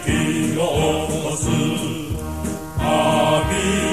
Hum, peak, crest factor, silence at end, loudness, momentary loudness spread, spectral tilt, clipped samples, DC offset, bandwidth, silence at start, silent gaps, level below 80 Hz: none; -6 dBFS; 14 dB; 0 s; -20 LUFS; 9 LU; -5 dB/octave; under 0.1%; 0.7%; 14 kHz; 0 s; none; -34 dBFS